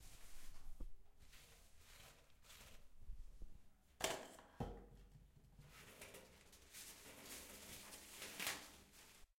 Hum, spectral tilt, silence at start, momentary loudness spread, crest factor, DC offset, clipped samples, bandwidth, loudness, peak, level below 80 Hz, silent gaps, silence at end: none; -2 dB/octave; 0 s; 20 LU; 30 dB; under 0.1%; under 0.1%; 16.5 kHz; -53 LUFS; -24 dBFS; -62 dBFS; none; 0.15 s